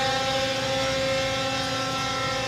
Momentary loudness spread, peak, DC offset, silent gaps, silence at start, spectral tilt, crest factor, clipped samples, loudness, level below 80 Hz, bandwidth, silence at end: 2 LU; -12 dBFS; under 0.1%; none; 0 s; -3 dB/octave; 14 dB; under 0.1%; -25 LUFS; -48 dBFS; 16 kHz; 0 s